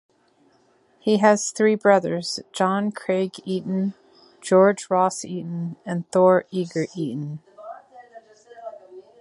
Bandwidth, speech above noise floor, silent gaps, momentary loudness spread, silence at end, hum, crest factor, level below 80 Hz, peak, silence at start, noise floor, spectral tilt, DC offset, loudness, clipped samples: 11.5 kHz; 40 dB; none; 22 LU; 0.2 s; none; 20 dB; -72 dBFS; -2 dBFS; 1.05 s; -61 dBFS; -5.5 dB/octave; under 0.1%; -22 LUFS; under 0.1%